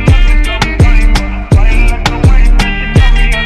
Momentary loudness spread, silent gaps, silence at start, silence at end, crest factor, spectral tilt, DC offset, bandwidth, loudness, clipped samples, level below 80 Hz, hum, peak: 3 LU; none; 0 s; 0 s; 6 dB; -5.5 dB/octave; under 0.1%; 11.5 kHz; -11 LUFS; 0.2%; -8 dBFS; none; 0 dBFS